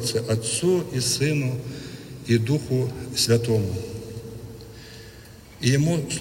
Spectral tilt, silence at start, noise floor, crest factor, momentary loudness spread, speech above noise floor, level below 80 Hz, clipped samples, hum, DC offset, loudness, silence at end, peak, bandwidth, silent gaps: -5 dB/octave; 0 s; -45 dBFS; 18 dB; 20 LU; 22 dB; -50 dBFS; under 0.1%; none; under 0.1%; -23 LUFS; 0 s; -6 dBFS; 16.5 kHz; none